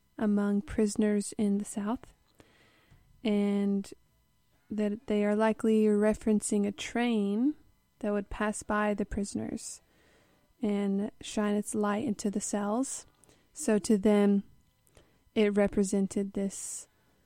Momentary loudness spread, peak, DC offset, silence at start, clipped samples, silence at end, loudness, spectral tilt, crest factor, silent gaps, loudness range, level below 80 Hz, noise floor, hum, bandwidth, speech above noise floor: 11 LU; -14 dBFS; under 0.1%; 0.2 s; under 0.1%; 0.4 s; -30 LUFS; -5.5 dB/octave; 18 dB; none; 5 LU; -56 dBFS; -70 dBFS; none; 13 kHz; 41 dB